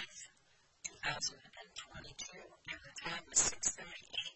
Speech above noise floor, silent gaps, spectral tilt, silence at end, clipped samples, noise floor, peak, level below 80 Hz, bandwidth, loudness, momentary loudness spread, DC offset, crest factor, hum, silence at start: 30 dB; none; 0 dB/octave; 0 s; under 0.1%; -71 dBFS; -16 dBFS; -66 dBFS; 9 kHz; -38 LUFS; 20 LU; under 0.1%; 26 dB; none; 0 s